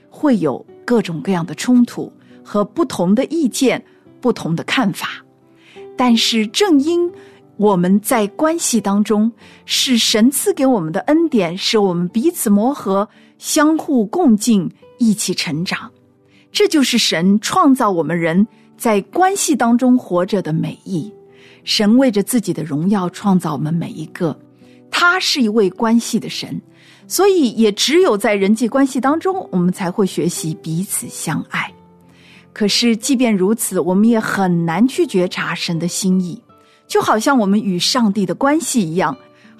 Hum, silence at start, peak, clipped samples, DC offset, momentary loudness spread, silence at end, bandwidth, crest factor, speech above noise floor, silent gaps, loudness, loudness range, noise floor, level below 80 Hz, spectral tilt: none; 0.15 s; -4 dBFS; under 0.1%; under 0.1%; 10 LU; 0.45 s; 14 kHz; 12 dB; 36 dB; none; -16 LUFS; 3 LU; -51 dBFS; -58 dBFS; -4.5 dB/octave